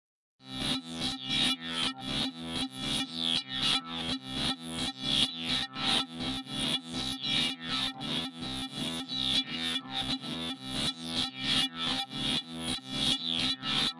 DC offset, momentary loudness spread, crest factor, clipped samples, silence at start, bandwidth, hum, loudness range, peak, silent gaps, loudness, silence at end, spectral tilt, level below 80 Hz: under 0.1%; 7 LU; 20 dB; under 0.1%; 0.4 s; 11.5 kHz; none; 2 LU; -14 dBFS; none; -30 LUFS; 0 s; -2.5 dB/octave; -56 dBFS